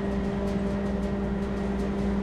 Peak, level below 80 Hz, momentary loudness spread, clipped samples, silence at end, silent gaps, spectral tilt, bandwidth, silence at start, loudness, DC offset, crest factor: -16 dBFS; -36 dBFS; 1 LU; under 0.1%; 0 s; none; -8 dB/octave; 10 kHz; 0 s; -29 LUFS; under 0.1%; 12 dB